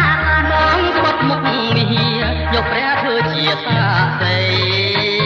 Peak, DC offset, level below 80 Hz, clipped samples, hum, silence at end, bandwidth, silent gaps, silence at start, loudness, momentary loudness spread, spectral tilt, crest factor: 0 dBFS; under 0.1%; -30 dBFS; under 0.1%; none; 0 s; 7.2 kHz; none; 0 s; -15 LUFS; 3 LU; -6.5 dB/octave; 14 dB